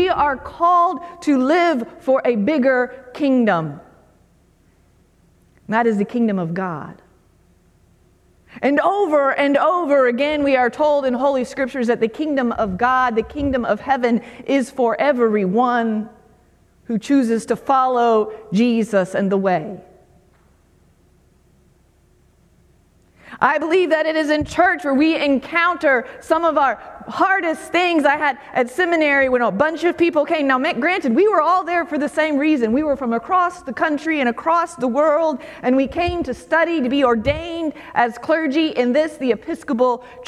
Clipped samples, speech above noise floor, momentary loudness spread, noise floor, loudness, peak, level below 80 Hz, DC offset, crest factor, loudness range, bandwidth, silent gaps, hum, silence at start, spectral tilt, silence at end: under 0.1%; 38 dB; 7 LU; -55 dBFS; -18 LUFS; 0 dBFS; -48 dBFS; under 0.1%; 18 dB; 6 LU; 13 kHz; none; none; 0 s; -6 dB/octave; 0.05 s